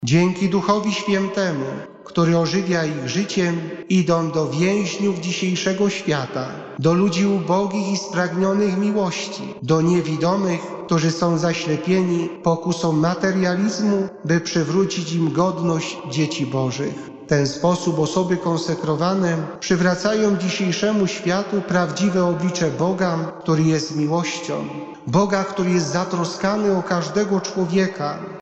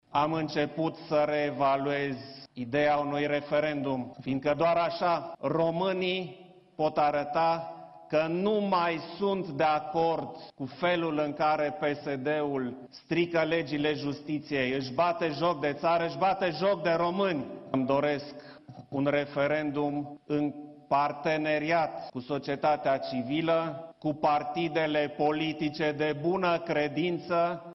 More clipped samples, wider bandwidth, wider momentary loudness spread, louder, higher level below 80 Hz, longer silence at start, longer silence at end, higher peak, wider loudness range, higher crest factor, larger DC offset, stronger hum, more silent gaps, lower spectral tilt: neither; first, 8.2 kHz vs 6.2 kHz; second, 5 LU vs 8 LU; first, -20 LUFS vs -29 LUFS; first, -58 dBFS vs -66 dBFS; about the same, 0 s vs 0.1 s; about the same, 0 s vs 0 s; first, -6 dBFS vs -12 dBFS; about the same, 1 LU vs 2 LU; about the same, 14 dB vs 16 dB; neither; neither; neither; second, -5.5 dB/octave vs -7 dB/octave